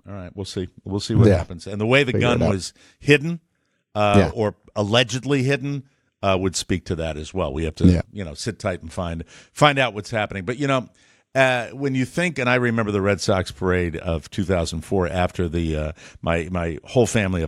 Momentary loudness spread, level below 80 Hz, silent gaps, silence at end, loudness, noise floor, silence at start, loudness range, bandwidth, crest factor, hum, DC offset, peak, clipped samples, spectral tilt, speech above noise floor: 12 LU; -40 dBFS; none; 0 s; -22 LUFS; -46 dBFS; 0.05 s; 3 LU; 13.5 kHz; 20 dB; none; under 0.1%; 0 dBFS; under 0.1%; -5.5 dB/octave; 25 dB